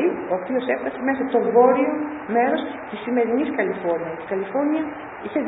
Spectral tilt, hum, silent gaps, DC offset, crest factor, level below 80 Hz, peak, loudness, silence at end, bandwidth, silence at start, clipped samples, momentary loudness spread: -10.5 dB/octave; none; none; under 0.1%; 18 dB; -62 dBFS; -4 dBFS; -22 LUFS; 0 s; 4 kHz; 0 s; under 0.1%; 11 LU